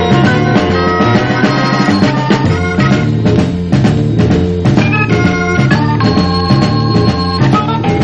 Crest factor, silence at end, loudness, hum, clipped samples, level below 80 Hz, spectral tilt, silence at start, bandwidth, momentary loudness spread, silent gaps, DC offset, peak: 10 dB; 0 s; -11 LUFS; none; 0.3%; -30 dBFS; -7 dB/octave; 0 s; 9 kHz; 2 LU; none; under 0.1%; 0 dBFS